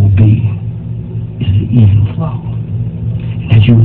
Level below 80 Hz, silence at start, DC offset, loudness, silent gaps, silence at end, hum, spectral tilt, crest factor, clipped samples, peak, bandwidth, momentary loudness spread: -26 dBFS; 0 s; 0.6%; -13 LUFS; none; 0 s; none; -11 dB/octave; 10 dB; 0.8%; 0 dBFS; 3.8 kHz; 13 LU